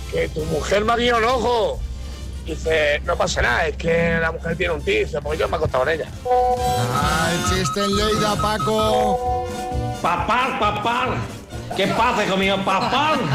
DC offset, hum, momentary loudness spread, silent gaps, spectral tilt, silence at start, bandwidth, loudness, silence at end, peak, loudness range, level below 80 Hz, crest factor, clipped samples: under 0.1%; none; 8 LU; none; -4.5 dB/octave; 0 s; 16 kHz; -20 LUFS; 0 s; -8 dBFS; 1 LU; -34 dBFS; 12 dB; under 0.1%